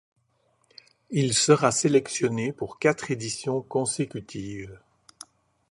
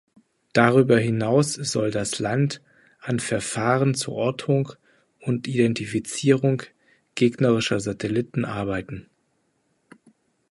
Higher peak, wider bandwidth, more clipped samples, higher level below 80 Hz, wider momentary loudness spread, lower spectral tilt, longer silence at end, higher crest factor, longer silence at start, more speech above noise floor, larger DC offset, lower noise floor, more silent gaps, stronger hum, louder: second, -6 dBFS vs -2 dBFS; about the same, 11.5 kHz vs 11.5 kHz; neither; second, -62 dBFS vs -56 dBFS; first, 16 LU vs 10 LU; second, -4 dB/octave vs -5.5 dB/octave; second, 0.95 s vs 1.5 s; about the same, 22 dB vs 22 dB; first, 1.1 s vs 0.55 s; about the same, 44 dB vs 47 dB; neither; about the same, -69 dBFS vs -70 dBFS; neither; neither; about the same, -25 LUFS vs -23 LUFS